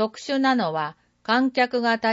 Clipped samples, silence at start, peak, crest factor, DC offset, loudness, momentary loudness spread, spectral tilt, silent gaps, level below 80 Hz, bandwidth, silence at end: under 0.1%; 0 s; -8 dBFS; 14 dB; under 0.1%; -23 LUFS; 9 LU; -4.5 dB/octave; none; -72 dBFS; 8 kHz; 0 s